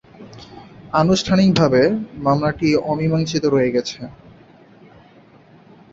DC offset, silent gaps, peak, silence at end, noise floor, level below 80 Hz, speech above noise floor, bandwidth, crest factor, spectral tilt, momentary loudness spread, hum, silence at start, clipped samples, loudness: under 0.1%; none; -2 dBFS; 1.8 s; -48 dBFS; -48 dBFS; 31 dB; 7.8 kHz; 18 dB; -6 dB/octave; 20 LU; none; 0.2 s; under 0.1%; -18 LUFS